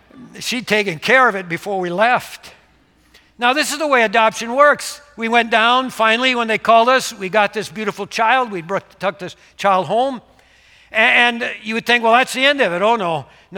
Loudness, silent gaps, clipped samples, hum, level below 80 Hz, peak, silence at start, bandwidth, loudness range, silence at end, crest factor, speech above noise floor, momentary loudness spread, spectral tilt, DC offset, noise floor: -16 LUFS; none; under 0.1%; none; -60 dBFS; 0 dBFS; 0.15 s; 18 kHz; 4 LU; 0 s; 16 dB; 38 dB; 12 LU; -3 dB/octave; under 0.1%; -54 dBFS